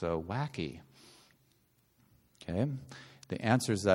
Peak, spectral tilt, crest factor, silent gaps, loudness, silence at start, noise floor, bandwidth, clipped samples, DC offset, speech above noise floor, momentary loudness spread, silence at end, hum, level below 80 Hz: -12 dBFS; -6 dB/octave; 24 dB; none; -34 LUFS; 0 s; -71 dBFS; 16.5 kHz; under 0.1%; under 0.1%; 38 dB; 21 LU; 0 s; none; -62 dBFS